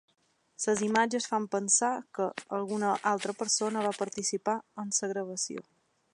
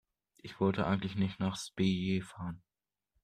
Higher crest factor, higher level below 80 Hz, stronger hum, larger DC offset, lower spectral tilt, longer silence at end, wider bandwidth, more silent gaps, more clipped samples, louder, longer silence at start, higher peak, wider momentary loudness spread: about the same, 22 dB vs 18 dB; second, -78 dBFS vs -64 dBFS; neither; neither; second, -2.5 dB/octave vs -6.5 dB/octave; second, 0.5 s vs 0.65 s; about the same, 11.5 kHz vs 10.5 kHz; neither; neither; first, -30 LUFS vs -34 LUFS; first, 0.6 s vs 0.45 s; first, -10 dBFS vs -16 dBFS; second, 9 LU vs 17 LU